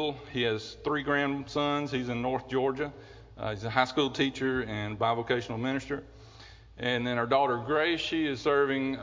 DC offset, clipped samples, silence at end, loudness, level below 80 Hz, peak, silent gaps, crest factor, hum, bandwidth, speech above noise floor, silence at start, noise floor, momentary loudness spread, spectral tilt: under 0.1%; under 0.1%; 0 s; -30 LUFS; -56 dBFS; -8 dBFS; none; 22 dB; none; 7.6 kHz; 22 dB; 0 s; -51 dBFS; 8 LU; -5.5 dB/octave